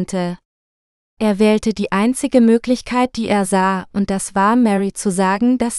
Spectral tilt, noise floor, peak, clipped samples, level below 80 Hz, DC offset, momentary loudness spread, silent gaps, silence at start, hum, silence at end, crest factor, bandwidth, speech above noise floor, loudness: -5.5 dB/octave; under -90 dBFS; 0 dBFS; under 0.1%; -46 dBFS; under 0.1%; 7 LU; 0.45-1.17 s; 0 s; none; 0 s; 16 dB; 12.5 kHz; over 74 dB; -17 LUFS